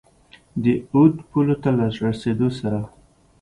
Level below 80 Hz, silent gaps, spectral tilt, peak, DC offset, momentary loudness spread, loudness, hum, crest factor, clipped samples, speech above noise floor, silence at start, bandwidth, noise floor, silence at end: -50 dBFS; none; -8.5 dB/octave; -2 dBFS; under 0.1%; 10 LU; -21 LUFS; none; 18 dB; under 0.1%; 33 dB; 0.55 s; 11 kHz; -52 dBFS; 0.55 s